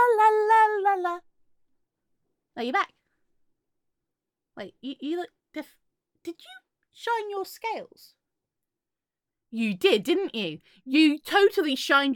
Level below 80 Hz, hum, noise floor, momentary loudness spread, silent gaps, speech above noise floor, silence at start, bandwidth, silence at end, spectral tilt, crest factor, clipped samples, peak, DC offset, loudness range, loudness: -80 dBFS; none; -90 dBFS; 21 LU; none; 64 dB; 0 s; 17.5 kHz; 0 s; -4 dB/octave; 18 dB; under 0.1%; -8 dBFS; under 0.1%; 14 LU; -24 LUFS